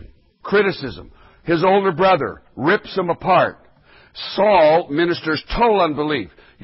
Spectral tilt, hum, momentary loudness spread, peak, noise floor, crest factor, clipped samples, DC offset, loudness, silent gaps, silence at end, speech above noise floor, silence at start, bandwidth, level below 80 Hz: -10 dB/octave; none; 14 LU; -4 dBFS; -50 dBFS; 14 dB; under 0.1%; under 0.1%; -18 LUFS; none; 0.35 s; 33 dB; 0 s; 5.8 kHz; -42 dBFS